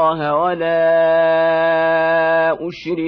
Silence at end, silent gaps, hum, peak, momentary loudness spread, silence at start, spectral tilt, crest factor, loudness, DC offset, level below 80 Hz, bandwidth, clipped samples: 0 s; none; none; -6 dBFS; 5 LU; 0 s; -7 dB/octave; 10 dB; -15 LUFS; under 0.1%; -54 dBFS; 5.4 kHz; under 0.1%